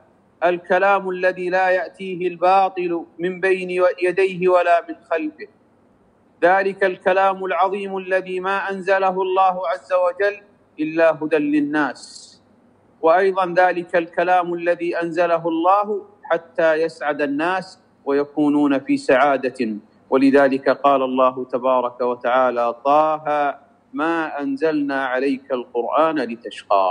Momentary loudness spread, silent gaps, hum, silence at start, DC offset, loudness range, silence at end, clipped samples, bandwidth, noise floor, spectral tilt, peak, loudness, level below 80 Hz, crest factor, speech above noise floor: 9 LU; none; none; 0.4 s; under 0.1%; 3 LU; 0 s; under 0.1%; 10.5 kHz; -56 dBFS; -6 dB/octave; -4 dBFS; -19 LUFS; -72 dBFS; 16 dB; 37 dB